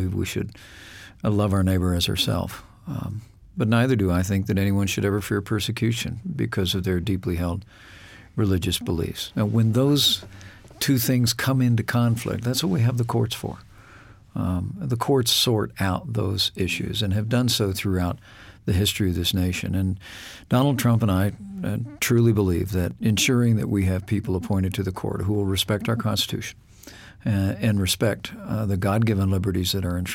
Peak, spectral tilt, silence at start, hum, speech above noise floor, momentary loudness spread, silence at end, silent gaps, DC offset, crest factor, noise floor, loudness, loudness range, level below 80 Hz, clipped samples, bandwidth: -8 dBFS; -5 dB/octave; 0 s; none; 25 dB; 12 LU; 0 s; none; under 0.1%; 16 dB; -48 dBFS; -23 LUFS; 4 LU; -46 dBFS; under 0.1%; 17 kHz